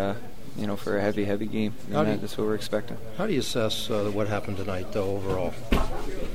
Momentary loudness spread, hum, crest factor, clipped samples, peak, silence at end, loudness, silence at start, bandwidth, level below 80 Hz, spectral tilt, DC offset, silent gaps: 7 LU; none; 20 dB; under 0.1%; -8 dBFS; 0 s; -29 LUFS; 0 s; 16 kHz; -38 dBFS; -5.5 dB/octave; 3%; none